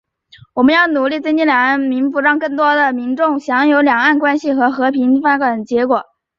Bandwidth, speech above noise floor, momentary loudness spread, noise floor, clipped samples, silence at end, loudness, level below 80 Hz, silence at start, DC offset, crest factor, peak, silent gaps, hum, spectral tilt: 7.4 kHz; 32 dB; 5 LU; -46 dBFS; under 0.1%; 0.35 s; -14 LUFS; -60 dBFS; 0.55 s; under 0.1%; 14 dB; -2 dBFS; none; none; -5 dB/octave